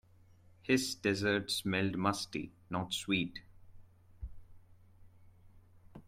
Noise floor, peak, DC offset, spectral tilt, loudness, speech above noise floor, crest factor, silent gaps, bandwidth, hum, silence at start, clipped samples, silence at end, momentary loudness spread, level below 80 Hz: -62 dBFS; -16 dBFS; under 0.1%; -4 dB/octave; -34 LUFS; 28 dB; 22 dB; none; 16 kHz; none; 0.65 s; under 0.1%; 0.05 s; 20 LU; -60 dBFS